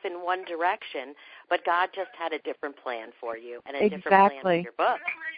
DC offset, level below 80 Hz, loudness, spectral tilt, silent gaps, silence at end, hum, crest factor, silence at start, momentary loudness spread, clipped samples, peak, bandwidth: under 0.1%; -72 dBFS; -27 LUFS; -9 dB/octave; none; 0 s; none; 24 dB; 0.05 s; 16 LU; under 0.1%; -4 dBFS; 5 kHz